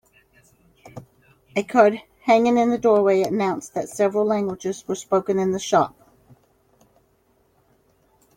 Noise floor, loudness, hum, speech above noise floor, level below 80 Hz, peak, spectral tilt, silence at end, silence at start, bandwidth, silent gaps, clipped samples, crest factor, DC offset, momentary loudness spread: -63 dBFS; -21 LUFS; none; 43 dB; -64 dBFS; -2 dBFS; -5.5 dB/octave; 2.5 s; 0.85 s; 16.5 kHz; none; under 0.1%; 20 dB; under 0.1%; 12 LU